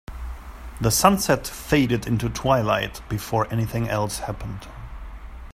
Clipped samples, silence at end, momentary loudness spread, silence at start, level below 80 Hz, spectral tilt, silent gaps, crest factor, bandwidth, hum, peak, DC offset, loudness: under 0.1%; 0 s; 22 LU; 0.1 s; -38 dBFS; -5 dB/octave; none; 22 dB; 16 kHz; none; 0 dBFS; under 0.1%; -23 LUFS